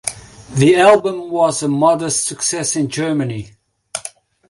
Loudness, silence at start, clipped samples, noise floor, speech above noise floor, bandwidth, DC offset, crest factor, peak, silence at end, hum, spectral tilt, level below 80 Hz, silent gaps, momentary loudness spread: -15 LUFS; 0.05 s; under 0.1%; -37 dBFS; 22 dB; 11.5 kHz; under 0.1%; 16 dB; 0 dBFS; 0.4 s; none; -4.5 dB/octave; -52 dBFS; none; 17 LU